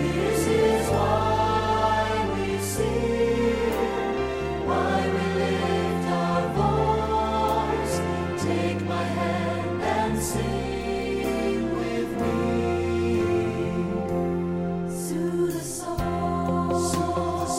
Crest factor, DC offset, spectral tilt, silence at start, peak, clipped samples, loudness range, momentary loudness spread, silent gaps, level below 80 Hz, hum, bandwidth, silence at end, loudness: 14 dB; under 0.1%; -5.5 dB/octave; 0 s; -10 dBFS; under 0.1%; 3 LU; 5 LU; none; -40 dBFS; none; 16 kHz; 0 s; -25 LUFS